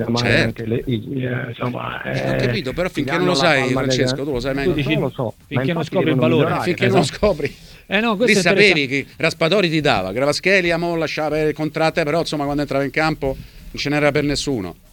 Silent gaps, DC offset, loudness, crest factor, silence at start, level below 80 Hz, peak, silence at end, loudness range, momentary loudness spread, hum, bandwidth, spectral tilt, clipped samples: none; under 0.1%; -18 LUFS; 18 dB; 0 s; -40 dBFS; 0 dBFS; 0.2 s; 4 LU; 9 LU; none; 19 kHz; -5 dB/octave; under 0.1%